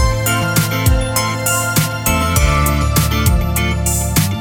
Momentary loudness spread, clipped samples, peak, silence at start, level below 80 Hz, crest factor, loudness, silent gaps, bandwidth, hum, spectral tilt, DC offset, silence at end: 2 LU; under 0.1%; 0 dBFS; 0 s; -20 dBFS; 14 dB; -15 LUFS; none; over 20 kHz; none; -4 dB/octave; under 0.1%; 0 s